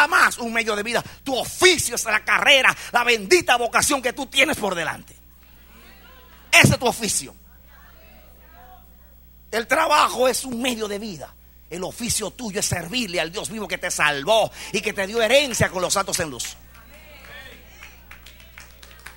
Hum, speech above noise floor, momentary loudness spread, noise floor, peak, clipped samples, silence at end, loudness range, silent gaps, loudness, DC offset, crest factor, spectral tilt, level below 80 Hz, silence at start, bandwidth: 60 Hz at -50 dBFS; 27 dB; 15 LU; -48 dBFS; 0 dBFS; under 0.1%; 0.05 s; 8 LU; none; -20 LUFS; under 0.1%; 22 dB; -2.5 dB/octave; -48 dBFS; 0 s; 16.5 kHz